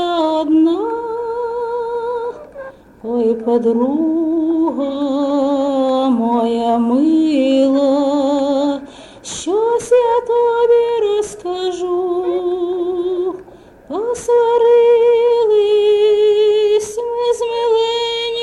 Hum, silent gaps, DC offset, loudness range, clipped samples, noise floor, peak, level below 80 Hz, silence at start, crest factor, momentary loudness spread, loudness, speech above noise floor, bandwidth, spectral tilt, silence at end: none; none; under 0.1%; 6 LU; under 0.1%; -40 dBFS; -4 dBFS; -54 dBFS; 0 s; 12 dB; 10 LU; -15 LUFS; 26 dB; 11.5 kHz; -4.5 dB/octave; 0 s